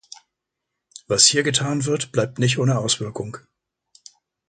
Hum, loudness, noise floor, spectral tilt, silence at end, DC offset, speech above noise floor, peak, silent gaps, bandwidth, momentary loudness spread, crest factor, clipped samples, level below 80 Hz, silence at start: none; -19 LUFS; -81 dBFS; -3 dB/octave; 1.1 s; under 0.1%; 61 dB; 0 dBFS; none; 9.4 kHz; 17 LU; 24 dB; under 0.1%; -58 dBFS; 1.1 s